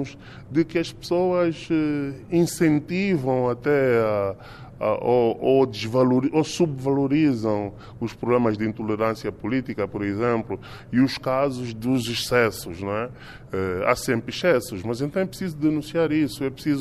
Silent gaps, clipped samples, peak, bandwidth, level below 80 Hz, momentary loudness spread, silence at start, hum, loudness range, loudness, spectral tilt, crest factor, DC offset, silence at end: none; under 0.1%; -4 dBFS; 15 kHz; -52 dBFS; 9 LU; 0 s; none; 3 LU; -23 LUFS; -6 dB/octave; 20 dB; under 0.1%; 0 s